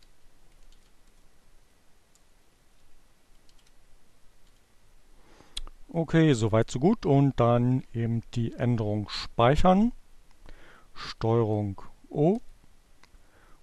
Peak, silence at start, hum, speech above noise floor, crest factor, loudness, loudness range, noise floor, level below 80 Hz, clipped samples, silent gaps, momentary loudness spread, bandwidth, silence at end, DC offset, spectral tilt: -8 dBFS; 0.25 s; none; 34 dB; 20 dB; -26 LUFS; 6 LU; -58 dBFS; -44 dBFS; under 0.1%; none; 17 LU; 11.5 kHz; 1.1 s; under 0.1%; -7.5 dB/octave